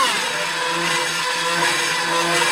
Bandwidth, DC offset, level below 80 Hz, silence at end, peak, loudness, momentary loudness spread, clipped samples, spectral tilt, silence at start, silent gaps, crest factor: 16.5 kHz; under 0.1%; -66 dBFS; 0 s; -6 dBFS; -19 LUFS; 3 LU; under 0.1%; -1 dB/octave; 0 s; none; 14 dB